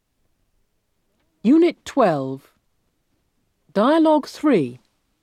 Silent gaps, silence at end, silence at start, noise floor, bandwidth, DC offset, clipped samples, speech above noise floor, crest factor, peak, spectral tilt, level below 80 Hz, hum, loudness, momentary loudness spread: none; 0.45 s; 1.45 s; -69 dBFS; 12 kHz; under 0.1%; under 0.1%; 51 dB; 18 dB; -4 dBFS; -6.5 dB/octave; -66 dBFS; none; -19 LUFS; 12 LU